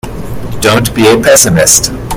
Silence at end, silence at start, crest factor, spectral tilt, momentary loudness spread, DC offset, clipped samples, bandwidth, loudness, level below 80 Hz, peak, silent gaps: 0 s; 0.05 s; 8 dB; -3 dB/octave; 17 LU; under 0.1%; 2%; over 20 kHz; -6 LUFS; -28 dBFS; 0 dBFS; none